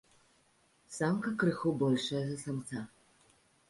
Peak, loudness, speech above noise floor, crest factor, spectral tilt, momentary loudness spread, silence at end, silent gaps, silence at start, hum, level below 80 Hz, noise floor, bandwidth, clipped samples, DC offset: -18 dBFS; -34 LUFS; 37 dB; 18 dB; -6 dB/octave; 12 LU; 0.8 s; none; 0.9 s; none; -70 dBFS; -70 dBFS; 11.5 kHz; under 0.1%; under 0.1%